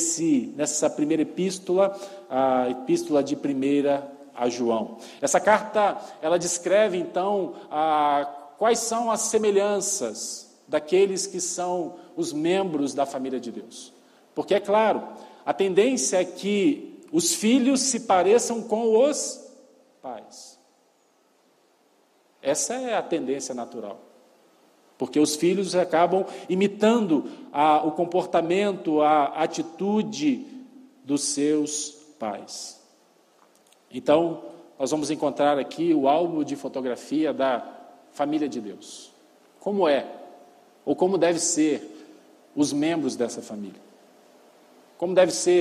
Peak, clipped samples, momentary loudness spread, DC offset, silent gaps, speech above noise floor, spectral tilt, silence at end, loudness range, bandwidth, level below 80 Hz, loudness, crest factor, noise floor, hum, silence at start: -6 dBFS; under 0.1%; 16 LU; under 0.1%; none; 40 dB; -4 dB/octave; 0 s; 7 LU; 14.5 kHz; -74 dBFS; -24 LUFS; 20 dB; -63 dBFS; none; 0 s